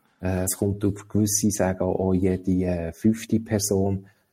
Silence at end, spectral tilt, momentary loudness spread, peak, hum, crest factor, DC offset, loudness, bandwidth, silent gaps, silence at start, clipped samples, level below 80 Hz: 0.3 s; -5.5 dB/octave; 6 LU; -8 dBFS; none; 16 dB; under 0.1%; -24 LUFS; 16.5 kHz; none; 0.2 s; under 0.1%; -50 dBFS